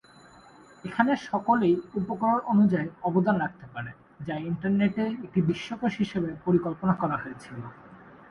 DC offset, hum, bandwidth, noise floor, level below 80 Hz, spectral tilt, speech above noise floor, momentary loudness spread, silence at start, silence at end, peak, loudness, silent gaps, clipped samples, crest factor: under 0.1%; none; 7.2 kHz; -53 dBFS; -60 dBFS; -8 dB/octave; 27 dB; 16 LU; 0.85 s; 0.15 s; -6 dBFS; -27 LUFS; none; under 0.1%; 20 dB